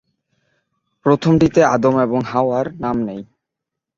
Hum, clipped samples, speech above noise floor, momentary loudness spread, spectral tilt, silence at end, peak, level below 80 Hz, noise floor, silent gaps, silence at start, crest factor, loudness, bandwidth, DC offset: none; under 0.1%; 67 dB; 9 LU; -7.5 dB/octave; 0.75 s; 0 dBFS; -48 dBFS; -82 dBFS; none; 1.05 s; 18 dB; -17 LUFS; 7.6 kHz; under 0.1%